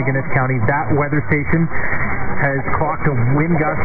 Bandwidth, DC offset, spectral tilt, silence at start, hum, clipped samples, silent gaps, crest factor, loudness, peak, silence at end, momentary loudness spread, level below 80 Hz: 3.1 kHz; 8%; -13.5 dB/octave; 0 s; none; under 0.1%; none; 14 dB; -18 LUFS; -2 dBFS; 0 s; 4 LU; -34 dBFS